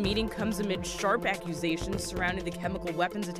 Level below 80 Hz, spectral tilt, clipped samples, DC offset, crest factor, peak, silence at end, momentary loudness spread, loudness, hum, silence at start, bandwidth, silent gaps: -46 dBFS; -4.5 dB/octave; under 0.1%; under 0.1%; 18 dB; -14 dBFS; 0 s; 5 LU; -31 LUFS; none; 0 s; 15.5 kHz; none